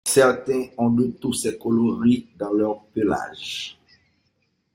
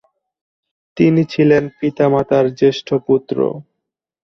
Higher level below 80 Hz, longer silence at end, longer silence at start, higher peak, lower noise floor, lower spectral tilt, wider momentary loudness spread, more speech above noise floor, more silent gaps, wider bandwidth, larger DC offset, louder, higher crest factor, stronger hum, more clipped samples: about the same, -58 dBFS vs -56 dBFS; first, 1.05 s vs 0.65 s; second, 0.05 s vs 0.95 s; about the same, -4 dBFS vs -2 dBFS; second, -70 dBFS vs -79 dBFS; second, -4.5 dB/octave vs -8 dB/octave; first, 11 LU vs 8 LU; second, 48 dB vs 64 dB; neither; first, 16.5 kHz vs 6.4 kHz; neither; second, -22 LUFS vs -15 LUFS; about the same, 18 dB vs 16 dB; neither; neither